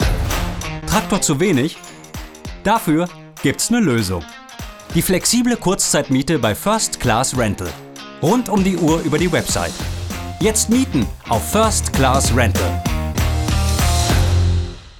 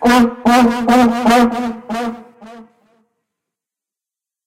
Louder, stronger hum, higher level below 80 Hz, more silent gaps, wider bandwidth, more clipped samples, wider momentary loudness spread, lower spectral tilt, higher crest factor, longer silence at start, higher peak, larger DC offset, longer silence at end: second, -17 LUFS vs -13 LUFS; neither; first, -28 dBFS vs -44 dBFS; neither; first, 18.5 kHz vs 16 kHz; neither; about the same, 12 LU vs 11 LU; about the same, -4.5 dB/octave vs -4.5 dB/octave; about the same, 18 dB vs 14 dB; about the same, 0 s vs 0 s; about the same, 0 dBFS vs -2 dBFS; neither; second, 0 s vs 1.85 s